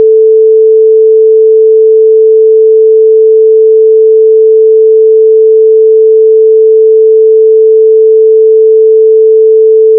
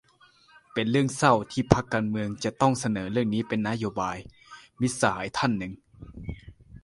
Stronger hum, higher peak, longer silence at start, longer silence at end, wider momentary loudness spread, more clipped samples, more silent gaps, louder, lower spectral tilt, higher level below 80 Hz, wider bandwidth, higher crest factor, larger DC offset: neither; about the same, 0 dBFS vs 0 dBFS; second, 0 s vs 0.75 s; about the same, 0 s vs 0.05 s; second, 0 LU vs 18 LU; neither; neither; first, -4 LUFS vs -26 LUFS; first, -13 dB/octave vs -5.5 dB/octave; second, under -90 dBFS vs -50 dBFS; second, 0.5 kHz vs 11.5 kHz; second, 4 dB vs 26 dB; neither